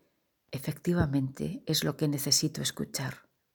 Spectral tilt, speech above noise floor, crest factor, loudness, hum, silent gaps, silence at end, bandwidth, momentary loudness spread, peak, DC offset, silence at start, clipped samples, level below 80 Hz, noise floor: -4 dB/octave; 43 dB; 20 dB; -30 LUFS; none; none; 0.35 s; over 20 kHz; 13 LU; -12 dBFS; under 0.1%; 0.5 s; under 0.1%; -54 dBFS; -74 dBFS